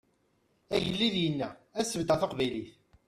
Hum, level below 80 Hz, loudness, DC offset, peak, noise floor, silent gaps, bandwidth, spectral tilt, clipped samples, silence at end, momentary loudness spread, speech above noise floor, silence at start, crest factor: none; -60 dBFS; -31 LUFS; under 0.1%; -14 dBFS; -72 dBFS; none; 14.5 kHz; -4.5 dB/octave; under 0.1%; 0.35 s; 9 LU; 41 dB; 0.7 s; 20 dB